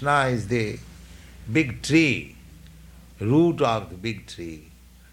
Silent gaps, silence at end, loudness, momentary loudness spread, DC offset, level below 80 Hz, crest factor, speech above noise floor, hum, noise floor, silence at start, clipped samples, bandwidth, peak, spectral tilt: none; 0.5 s; -23 LUFS; 19 LU; under 0.1%; -48 dBFS; 18 dB; 24 dB; none; -47 dBFS; 0 s; under 0.1%; 15.5 kHz; -8 dBFS; -6 dB/octave